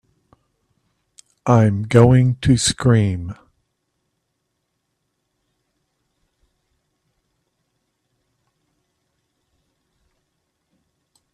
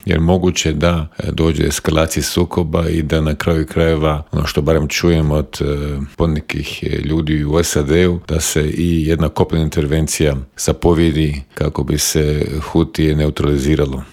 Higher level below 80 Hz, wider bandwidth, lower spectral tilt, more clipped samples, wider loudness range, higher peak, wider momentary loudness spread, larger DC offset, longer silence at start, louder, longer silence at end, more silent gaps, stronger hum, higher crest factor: second, -46 dBFS vs -28 dBFS; second, 11 kHz vs 16.5 kHz; about the same, -6 dB/octave vs -5.5 dB/octave; neither; first, 8 LU vs 1 LU; about the same, 0 dBFS vs 0 dBFS; first, 15 LU vs 6 LU; neither; first, 1.45 s vs 0.05 s; about the same, -16 LUFS vs -16 LUFS; first, 8 s vs 0.05 s; neither; neither; first, 22 dB vs 16 dB